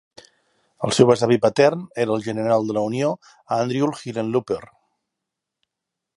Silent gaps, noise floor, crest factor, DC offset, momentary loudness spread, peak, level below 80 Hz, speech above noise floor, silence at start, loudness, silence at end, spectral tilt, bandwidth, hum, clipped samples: none; -83 dBFS; 22 dB; under 0.1%; 11 LU; 0 dBFS; -62 dBFS; 63 dB; 0.8 s; -21 LUFS; 1.5 s; -5.5 dB/octave; 11.5 kHz; none; under 0.1%